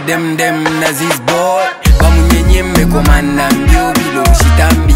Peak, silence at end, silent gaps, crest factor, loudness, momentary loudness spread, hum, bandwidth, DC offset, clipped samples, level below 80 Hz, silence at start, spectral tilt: 0 dBFS; 0 s; none; 8 dB; -10 LUFS; 4 LU; none; 16.5 kHz; under 0.1%; 1%; -12 dBFS; 0 s; -5 dB/octave